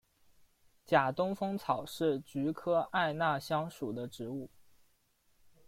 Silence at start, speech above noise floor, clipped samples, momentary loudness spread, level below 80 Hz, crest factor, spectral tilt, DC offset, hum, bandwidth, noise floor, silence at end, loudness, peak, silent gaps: 0.9 s; 39 dB; under 0.1%; 11 LU; -70 dBFS; 22 dB; -6 dB/octave; under 0.1%; none; 16.5 kHz; -72 dBFS; 1.2 s; -34 LUFS; -14 dBFS; none